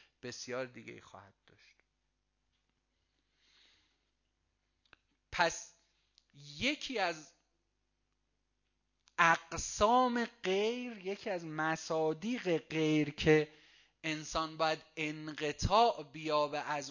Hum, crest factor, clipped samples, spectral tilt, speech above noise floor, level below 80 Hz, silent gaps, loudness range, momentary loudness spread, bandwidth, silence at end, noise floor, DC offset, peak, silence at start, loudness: 50 Hz at -70 dBFS; 24 dB; under 0.1%; -4 dB/octave; 48 dB; -58 dBFS; none; 9 LU; 16 LU; 7.4 kHz; 0 s; -83 dBFS; under 0.1%; -12 dBFS; 0.25 s; -34 LUFS